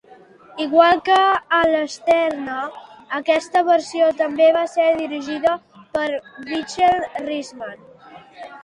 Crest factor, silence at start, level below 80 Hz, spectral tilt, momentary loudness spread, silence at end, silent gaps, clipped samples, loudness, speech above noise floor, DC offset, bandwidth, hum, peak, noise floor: 18 dB; 0.1 s; -58 dBFS; -3.5 dB/octave; 14 LU; 0 s; none; under 0.1%; -19 LUFS; 28 dB; under 0.1%; 11 kHz; none; 0 dBFS; -47 dBFS